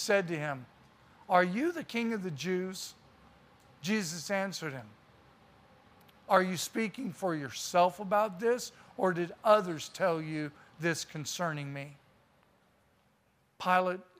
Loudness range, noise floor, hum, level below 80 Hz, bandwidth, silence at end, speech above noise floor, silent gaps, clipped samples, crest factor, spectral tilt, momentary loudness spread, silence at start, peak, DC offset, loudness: 8 LU; -71 dBFS; none; -74 dBFS; 15.5 kHz; 0.15 s; 39 dB; none; under 0.1%; 22 dB; -4.5 dB/octave; 13 LU; 0 s; -10 dBFS; under 0.1%; -32 LUFS